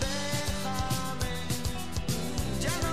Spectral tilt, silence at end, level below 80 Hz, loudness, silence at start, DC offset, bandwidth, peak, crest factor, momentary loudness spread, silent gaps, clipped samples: -4 dB/octave; 0 s; -40 dBFS; -32 LUFS; 0 s; 1%; 16 kHz; -16 dBFS; 16 dB; 3 LU; none; under 0.1%